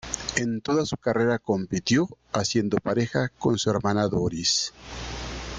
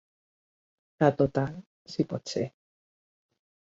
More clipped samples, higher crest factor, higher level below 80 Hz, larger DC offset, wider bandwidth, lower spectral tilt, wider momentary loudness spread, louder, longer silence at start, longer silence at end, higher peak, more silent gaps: neither; second, 18 dB vs 24 dB; first, -46 dBFS vs -64 dBFS; neither; first, 9.6 kHz vs 7.8 kHz; second, -4.5 dB/octave vs -6.5 dB/octave; second, 8 LU vs 13 LU; first, -25 LUFS vs -29 LUFS; second, 0.05 s vs 1 s; second, 0 s vs 1.15 s; about the same, -8 dBFS vs -8 dBFS; second, none vs 1.66-1.85 s